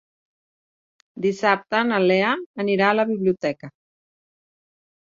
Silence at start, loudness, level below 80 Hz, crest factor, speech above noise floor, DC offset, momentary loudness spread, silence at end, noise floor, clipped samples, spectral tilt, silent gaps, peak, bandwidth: 1.15 s; -21 LUFS; -68 dBFS; 22 dB; over 69 dB; under 0.1%; 7 LU; 1.35 s; under -90 dBFS; under 0.1%; -6 dB/octave; 2.46-2.54 s; -2 dBFS; 7.6 kHz